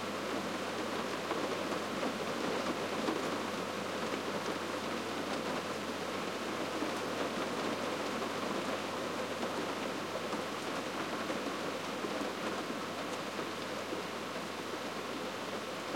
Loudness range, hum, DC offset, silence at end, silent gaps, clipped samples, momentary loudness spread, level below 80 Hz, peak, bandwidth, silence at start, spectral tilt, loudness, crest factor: 2 LU; none; under 0.1%; 0 s; none; under 0.1%; 3 LU; -78 dBFS; -20 dBFS; 16.5 kHz; 0 s; -3.5 dB/octave; -37 LUFS; 18 dB